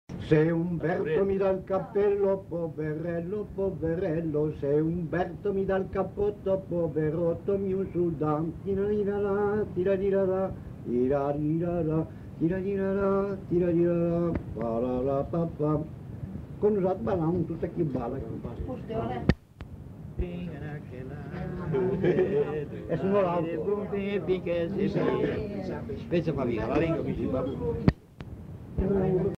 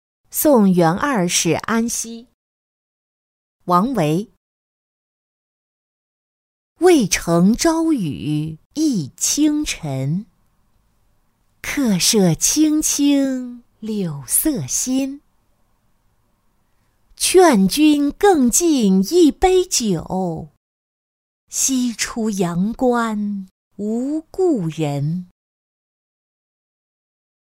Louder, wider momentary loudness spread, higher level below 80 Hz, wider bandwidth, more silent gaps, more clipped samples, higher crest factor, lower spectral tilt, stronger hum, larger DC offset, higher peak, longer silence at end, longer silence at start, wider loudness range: second, -29 LUFS vs -17 LUFS; about the same, 11 LU vs 13 LU; about the same, -46 dBFS vs -46 dBFS; second, 6.8 kHz vs 16.5 kHz; second, none vs 2.34-3.60 s, 4.37-6.76 s, 8.66-8.70 s, 20.57-21.47 s, 23.51-23.71 s; neither; about the same, 22 dB vs 18 dB; first, -9.5 dB/octave vs -4.5 dB/octave; neither; neither; second, -6 dBFS vs -2 dBFS; second, 0 s vs 2.35 s; second, 0.1 s vs 0.35 s; second, 3 LU vs 9 LU